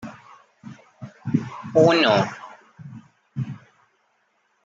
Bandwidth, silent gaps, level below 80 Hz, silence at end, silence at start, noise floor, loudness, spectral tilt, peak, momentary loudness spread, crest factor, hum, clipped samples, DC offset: 7.8 kHz; none; -66 dBFS; 1.1 s; 0 s; -67 dBFS; -21 LUFS; -6 dB/octave; -4 dBFS; 28 LU; 22 dB; none; under 0.1%; under 0.1%